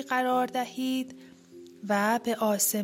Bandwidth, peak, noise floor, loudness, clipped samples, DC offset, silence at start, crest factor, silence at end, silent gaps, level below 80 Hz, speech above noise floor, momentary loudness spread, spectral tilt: 16.5 kHz; -12 dBFS; -50 dBFS; -28 LUFS; under 0.1%; under 0.1%; 0 s; 16 dB; 0 s; none; -78 dBFS; 22 dB; 8 LU; -3 dB/octave